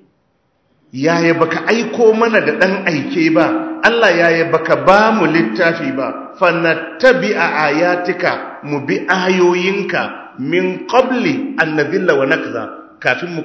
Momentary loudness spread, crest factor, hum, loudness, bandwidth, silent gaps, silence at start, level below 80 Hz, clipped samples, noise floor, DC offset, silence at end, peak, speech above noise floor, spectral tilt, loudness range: 9 LU; 14 dB; none; -14 LUFS; 8 kHz; none; 0.95 s; -56 dBFS; 0.2%; -61 dBFS; under 0.1%; 0 s; 0 dBFS; 47 dB; -5.5 dB/octave; 3 LU